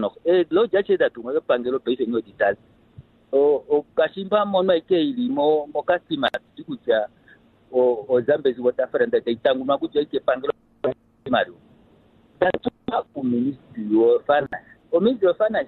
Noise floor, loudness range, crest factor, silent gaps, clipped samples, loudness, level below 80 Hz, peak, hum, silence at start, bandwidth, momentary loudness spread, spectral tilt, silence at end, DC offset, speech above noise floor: -55 dBFS; 4 LU; 18 dB; none; under 0.1%; -22 LUFS; -60 dBFS; -4 dBFS; none; 0 s; 4.4 kHz; 9 LU; -8 dB/octave; 0 s; under 0.1%; 34 dB